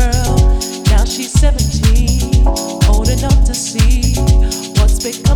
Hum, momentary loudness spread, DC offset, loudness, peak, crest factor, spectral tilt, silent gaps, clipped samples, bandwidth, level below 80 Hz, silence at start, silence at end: none; 2 LU; under 0.1%; -14 LUFS; 0 dBFS; 10 dB; -5 dB/octave; none; under 0.1%; 17 kHz; -12 dBFS; 0 s; 0 s